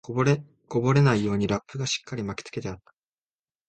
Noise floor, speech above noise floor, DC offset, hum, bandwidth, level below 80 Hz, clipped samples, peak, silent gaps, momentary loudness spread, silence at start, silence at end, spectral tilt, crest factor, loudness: under -90 dBFS; over 65 dB; under 0.1%; none; 8.8 kHz; -54 dBFS; under 0.1%; -8 dBFS; none; 14 LU; 0.1 s; 0.9 s; -6 dB/octave; 18 dB; -26 LUFS